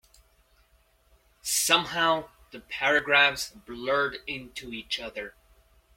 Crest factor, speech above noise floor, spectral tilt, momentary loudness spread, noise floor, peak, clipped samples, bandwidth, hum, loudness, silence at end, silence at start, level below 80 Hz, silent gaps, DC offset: 24 dB; 37 dB; -1 dB/octave; 17 LU; -64 dBFS; -6 dBFS; under 0.1%; 16.5 kHz; none; -25 LUFS; 0.65 s; 1.45 s; -60 dBFS; none; under 0.1%